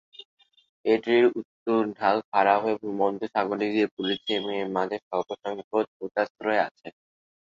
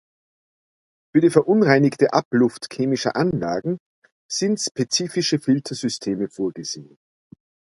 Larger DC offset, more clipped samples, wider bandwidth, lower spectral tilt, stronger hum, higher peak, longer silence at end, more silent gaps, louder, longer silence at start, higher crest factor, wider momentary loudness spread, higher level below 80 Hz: neither; neither; second, 7.4 kHz vs 11.5 kHz; about the same, -6 dB/octave vs -5 dB/octave; neither; second, -6 dBFS vs 0 dBFS; second, 0.5 s vs 0.95 s; first, 1.45-1.66 s, 2.25-2.32 s, 3.91-3.97 s, 5.02-5.11 s, 5.64-5.71 s, 5.87-6.00 s, 6.30-6.35 s, 6.71-6.75 s vs 2.25-2.31 s, 3.80-4.02 s, 4.12-4.29 s, 4.71-4.75 s; second, -26 LUFS vs -21 LUFS; second, 0.85 s vs 1.15 s; about the same, 20 dB vs 22 dB; about the same, 10 LU vs 11 LU; second, -72 dBFS vs -60 dBFS